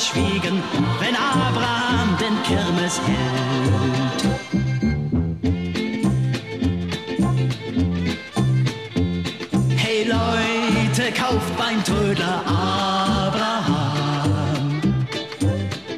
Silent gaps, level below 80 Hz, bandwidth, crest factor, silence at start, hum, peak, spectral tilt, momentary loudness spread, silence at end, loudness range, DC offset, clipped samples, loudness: none; -40 dBFS; 14 kHz; 14 dB; 0 s; none; -6 dBFS; -5.5 dB/octave; 4 LU; 0 s; 3 LU; 0.2%; under 0.1%; -21 LUFS